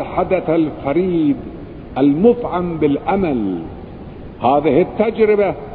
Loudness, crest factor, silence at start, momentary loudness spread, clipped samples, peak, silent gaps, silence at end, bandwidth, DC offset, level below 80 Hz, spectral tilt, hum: -16 LUFS; 16 dB; 0 s; 18 LU; under 0.1%; -2 dBFS; none; 0 s; 4.5 kHz; under 0.1%; -40 dBFS; -11.5 dB/octave; none